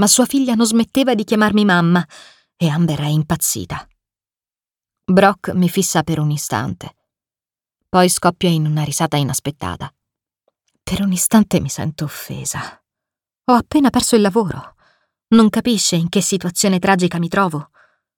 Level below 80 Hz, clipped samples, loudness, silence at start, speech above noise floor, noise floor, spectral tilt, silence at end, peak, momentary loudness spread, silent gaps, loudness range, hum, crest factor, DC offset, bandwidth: -48 dBFS; under 0.1%; -16 LUFS; 0 s; over 74 dB; under -90 dBFS; -4.5 dB/octave; 0.55 s; 0 dBFS; 14 LU; none; 4 LU; none; 16 dB; under 0.1%; 19 kHz